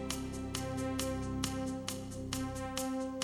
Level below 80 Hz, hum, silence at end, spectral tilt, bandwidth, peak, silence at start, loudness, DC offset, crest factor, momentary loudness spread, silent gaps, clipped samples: -50 dBFS; none; 0 s; -4.5 dB/octave; over 20 kHz; -18 dBFS; 0 s; -38 LUFS; under 0.1%; 20 dB; 4 LU; none; under 0.1%